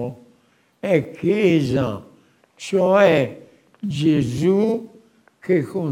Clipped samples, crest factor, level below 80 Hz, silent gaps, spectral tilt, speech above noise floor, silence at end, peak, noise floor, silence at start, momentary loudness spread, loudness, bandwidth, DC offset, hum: under 0.1%; 18 dB; -56 dBFS; none; -7 dB/octave; 41 dB; 0 s; -2 dBFS; -59 dBFS; 0 s; 17 LU; -19 LUFS; 16 kHz; under 0.1%; none